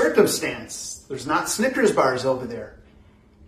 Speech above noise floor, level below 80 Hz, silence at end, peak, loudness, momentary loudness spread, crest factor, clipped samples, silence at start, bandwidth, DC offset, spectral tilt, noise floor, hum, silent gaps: 30 dB; -54 dBFS; 0.7 s; -4 dBFS; -22 LUFS; 14 LU; 20 dB; under 0.1%; 0 s; 15 kHz; under 0.1%; -3.5 dB/octave; -52 dBFS; none; none